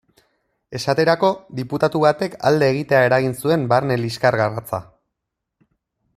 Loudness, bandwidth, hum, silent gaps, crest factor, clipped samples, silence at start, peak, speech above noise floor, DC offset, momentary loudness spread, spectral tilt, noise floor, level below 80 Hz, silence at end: -19 LUFS; 14.5 kHz; none; none; 18 dB; under 0.1%; 0.7 s; -2 dBFS; 62 dB; under 0.1%; 11 LU; -6 dB/octave; -80 dBFS; -58 dBFS; 1.35 s